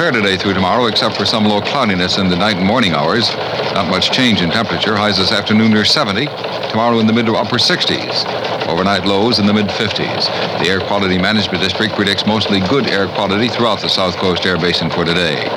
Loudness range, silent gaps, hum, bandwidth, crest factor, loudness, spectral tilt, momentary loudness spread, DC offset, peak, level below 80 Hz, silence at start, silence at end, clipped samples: 1 LU; none; none; 14.5 kHz; 12 dB; -14 LUFS; -5 dB/octave; 4 LU; under 0.1%; -2 dBFS; -50 dBFS; 0 s; 0 s; under 0.1%